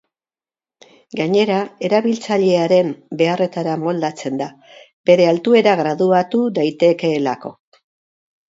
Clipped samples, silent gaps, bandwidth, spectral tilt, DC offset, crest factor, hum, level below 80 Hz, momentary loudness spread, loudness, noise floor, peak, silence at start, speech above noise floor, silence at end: under 0.1%; 4.93-5.04 s; 7.8 kHz; -6 dB/octave; under 0.1%; 18 dB; none; -68 dBFS; 11 LU; -17 LUFS; under -90 dBFS; 0 dBFS; 1.15 s; over 74 dB; 0.95 s